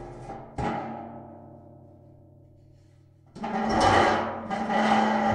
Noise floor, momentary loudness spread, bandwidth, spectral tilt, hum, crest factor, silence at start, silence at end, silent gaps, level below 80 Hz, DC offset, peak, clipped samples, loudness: -56 dBFS; 21 LU; 11.5 kHz; -5 dB/octave; none; 20 dB; 0 s; 0 s; none; -50 dBFS; under 0.1%; -6 dBFS; under 0.1%; -25 LUFS